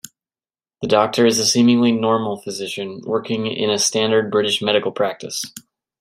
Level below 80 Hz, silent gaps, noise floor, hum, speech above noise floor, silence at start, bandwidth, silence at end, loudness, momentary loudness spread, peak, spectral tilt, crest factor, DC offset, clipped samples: -64 dBFS; none; under -90 dBFS; none; over 72 dB; 0.8 s; 16 kHz; 0.4 s; -18 LUFS; 12 LU; -2 dBFS; -3.5 dB/octave; 18 dB; under 0.1%; under 0.1%